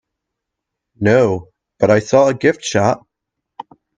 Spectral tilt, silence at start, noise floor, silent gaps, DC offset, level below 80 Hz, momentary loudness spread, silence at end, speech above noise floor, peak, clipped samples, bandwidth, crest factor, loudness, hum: -5.5 dB/octave; 1 s; -80 dBFS; none; under 0.1%; -54 dBFS; 7 LU; 1 s; 66 dB; 0 dBFS; under 0.1%; 9.8 kHz; 18 dB; -15 LUFS; none